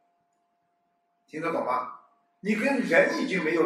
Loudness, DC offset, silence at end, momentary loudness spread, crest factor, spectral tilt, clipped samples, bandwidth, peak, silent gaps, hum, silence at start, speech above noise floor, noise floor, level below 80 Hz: -26 LUFS; under 0.1%; 0 s; 14 LU; 22 dB; -5.5 dB/octave; under 0.1%; 13.5 kHz; -6 dBFS; none; none; 1.35 s; 48 dB; -73 dBFS; -82 dBFS